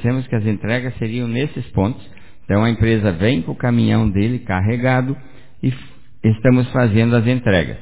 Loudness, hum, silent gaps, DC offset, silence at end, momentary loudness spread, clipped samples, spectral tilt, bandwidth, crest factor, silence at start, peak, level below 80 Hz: -18 LUFS; none; none; 2%; 0 s; 8 LU; under 0.1%; -11.5 dB/octave; 4 kHz; 16 dB; 0 s; -2 dBFS; -36 dBFS